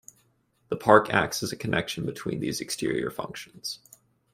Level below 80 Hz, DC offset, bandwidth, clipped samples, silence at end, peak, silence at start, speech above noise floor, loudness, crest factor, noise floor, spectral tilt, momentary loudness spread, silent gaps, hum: -60 dBFS; under 0.1%; 16 kHz; under 0.1%; 0.55 s; -2 dBFS; 0.7 s; 42 dB; -27 LUFS; 26 dB; -68 dBFS; -4.5 dB/octave; 16 LU; none; none